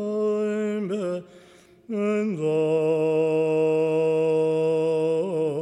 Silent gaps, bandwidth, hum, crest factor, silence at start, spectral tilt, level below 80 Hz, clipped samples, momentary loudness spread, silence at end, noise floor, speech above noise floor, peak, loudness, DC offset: none; 9.4 kHz; none; 10 dB; 0 s; -7.5 dB/octave; -72 dBFS; under 0.1%; 6 LU; 0 s; -52 dBFS; 30 dB; -14 dBFS; -24 LUFS; under 0.1%